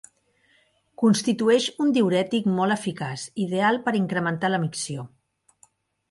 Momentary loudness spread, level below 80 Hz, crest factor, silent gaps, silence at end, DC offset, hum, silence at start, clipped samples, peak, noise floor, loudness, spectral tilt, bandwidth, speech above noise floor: 10 LU; -68 dBFS; 18 dB; none; 1.05 s; under 0.1%; none; 1 s; under 0.1%; -8 dBFS; -64 dBFS; -23 LUFS; -5 dB/octave; 11.5 kHz; 41 dB